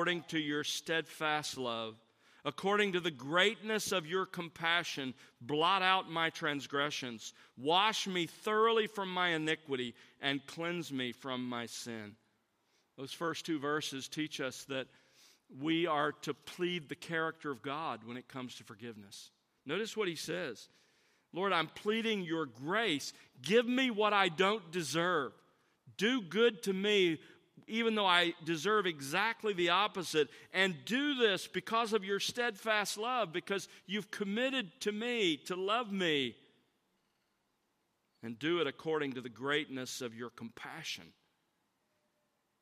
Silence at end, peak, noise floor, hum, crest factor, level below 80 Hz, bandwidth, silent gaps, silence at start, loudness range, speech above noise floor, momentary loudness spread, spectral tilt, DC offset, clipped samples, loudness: 1.5 s; -12 dBFS; -80 dBFS; none; 24 dB; -84 dBFS; 15 kHz; none; 0 s; 8 LU; 45 dB; 14 LU; -3.5 dB/octave; under 0.1%; under 0.1%; -34 LUFS